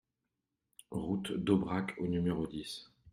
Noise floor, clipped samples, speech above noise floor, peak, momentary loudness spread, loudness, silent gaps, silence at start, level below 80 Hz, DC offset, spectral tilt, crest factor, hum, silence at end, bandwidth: -87 dBFS; under 0.1%; 53 dB; -16 dBFS; 12 LU; -35 LUFS; none; 0.9 s; -62 dBFS; under 0.1%; -6.5 dB/octave; 20 dB; none; 0 s; 14 kHz